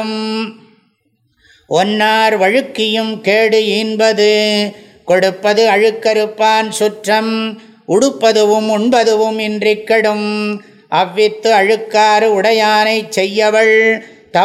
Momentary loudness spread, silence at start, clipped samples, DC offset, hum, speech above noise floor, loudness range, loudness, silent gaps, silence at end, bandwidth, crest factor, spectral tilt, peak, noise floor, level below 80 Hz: 8 LU; 0 s; under 0.1%; under 0.1%; none; 48 dB; 2 LU; -12 LUFS; none; 0 s; 14 kHz; 12 dB; -3.5 dB/octave; 0 dBFS; -61 dBFS; -64 dBFS